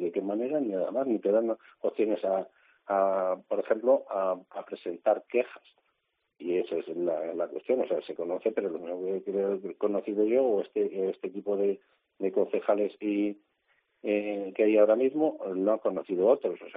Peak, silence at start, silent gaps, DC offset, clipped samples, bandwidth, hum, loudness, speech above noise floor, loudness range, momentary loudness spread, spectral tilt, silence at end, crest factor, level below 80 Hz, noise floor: -10 dBFS; 0 s; none; under 0.1%; under 0.1%; 4.7 kHz; none; -29 LUFS; 51 dB; 4 LU; 9 LU; -5.5 dB/octave; 0 s; 18 dB; -80 dBFS; -79 dBFS